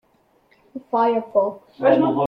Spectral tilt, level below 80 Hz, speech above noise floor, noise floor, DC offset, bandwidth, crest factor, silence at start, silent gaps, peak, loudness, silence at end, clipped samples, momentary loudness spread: -9 dB/octave; -66 dBFS; 41 dB; -61 dBFS; under 0.1%; 5.6 kHz; 16 dB; 0.75 s; none; -4 dBFS; -20 LUFS; 0 s; under 0.1%; 17 LU